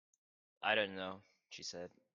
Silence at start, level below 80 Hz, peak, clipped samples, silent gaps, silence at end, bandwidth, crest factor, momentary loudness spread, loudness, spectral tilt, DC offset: 0.6 s; -86 dBFS; -18 dBFS; under 0.1%; none; 0.25 s; 7.6 kHz; 24 dB; 18 LU; -39 LUFS; -2.5 dB/octave; under 0.1%